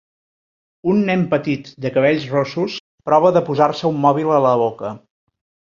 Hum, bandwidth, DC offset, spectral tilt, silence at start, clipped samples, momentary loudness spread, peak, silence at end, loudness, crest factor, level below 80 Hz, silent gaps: none; 7.2 kHz; under 0.1%; -7.5 dB/octave; 0.85 s; under 0.1%; 10 LU; -2 dBFS; 0.7 s; -17 LUFS; 16 dB; -60 dBFS; 2.80-2.98 s